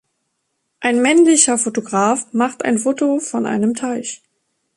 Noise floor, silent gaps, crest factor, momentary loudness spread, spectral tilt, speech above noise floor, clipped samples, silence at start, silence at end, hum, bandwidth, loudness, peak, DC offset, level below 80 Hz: -72 dBFS; none; 18 dB; 12 LU; -3 dB/octave; 55 dB; under 0.1%; 0.8 s; 0.6 s; none; 11.5 kHz; -16 LUFS; 0 dBFS; under 0.1%; -64 dBFS